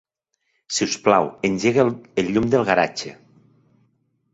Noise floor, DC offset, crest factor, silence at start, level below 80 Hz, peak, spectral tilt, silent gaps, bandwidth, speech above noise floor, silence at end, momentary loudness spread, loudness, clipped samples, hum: -73 dBFS; under 0.1%; 20 dB; 0.7 s; -54 dBFS; -2 dBFS; -4.5 dB/octave; none; 8 kHz; 54 dB; 1.2 s; 8 LU; -20 LUFS; under 0.1%; none